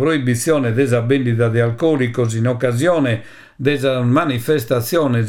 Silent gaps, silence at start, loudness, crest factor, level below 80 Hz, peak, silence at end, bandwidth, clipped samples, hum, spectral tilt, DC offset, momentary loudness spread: none; 0 s; -17 LUFS; 14 dB; -54 dBFS; -2 dBFS; 0 s; 17.5 kHz; under 0.1%; none; -6.5 dB/octave; under 0.1%; 3 LU